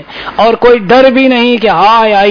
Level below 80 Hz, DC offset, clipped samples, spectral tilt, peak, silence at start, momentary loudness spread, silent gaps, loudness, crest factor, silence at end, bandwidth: -38 dBFS; under 0.1%; 3%; -6 dB/octave; 0 dBFS; 0 s; 5 LU; none; -6 LUFS; 6 dB; 0 s; 5.4 kHz